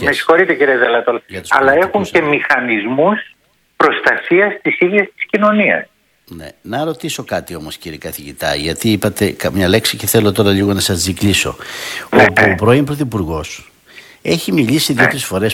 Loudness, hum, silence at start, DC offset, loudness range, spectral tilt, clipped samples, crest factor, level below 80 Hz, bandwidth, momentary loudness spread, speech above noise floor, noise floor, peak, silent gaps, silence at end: -14 LUFS; none; 0 s; under 0.1%; 6 LU; -4.5 dB/octave; 0.2%; 14 dB; -42 dBFS; 18 kHz; 14 LU; 27 dB; -41 dBFS; 0 dBFS; none; 0 s